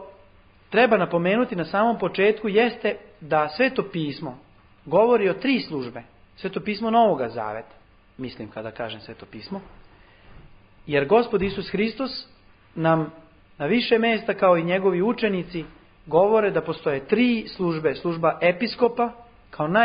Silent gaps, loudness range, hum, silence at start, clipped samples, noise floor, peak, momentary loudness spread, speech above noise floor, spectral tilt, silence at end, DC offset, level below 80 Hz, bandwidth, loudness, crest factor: none; 5 LU; none; 0 s; under 0.1%; -53 dBFS; -4 dBFS; 16 LU; 31 dB; -10.5 dB/octave; 0 s; under 0.1%; -56 dBFS; 5.2 kHz; -22 LUFS; 18 dB